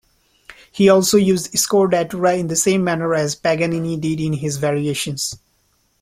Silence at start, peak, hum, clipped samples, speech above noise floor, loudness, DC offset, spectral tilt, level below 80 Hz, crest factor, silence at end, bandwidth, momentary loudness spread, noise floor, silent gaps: 0.5 s; -2 dBFS; none; under 0.1%; 45 dB; -18 LUFS; under 0.1%; -4.5 dB/octave; -54 dBFS; 16 dB; 0.65 s; 16 kHz; 8 LU; -62 dBFS; none